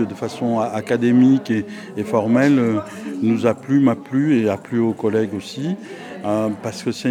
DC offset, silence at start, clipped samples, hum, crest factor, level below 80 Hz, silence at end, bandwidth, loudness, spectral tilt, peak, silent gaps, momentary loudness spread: under 0.1%; 0 s; under 0.1%; none; 16 dB; -66 dBFS; 0 s; 12.5 kHz; -19 LUFS; -7 dB/octave; -2 dBFS; none; 11 LU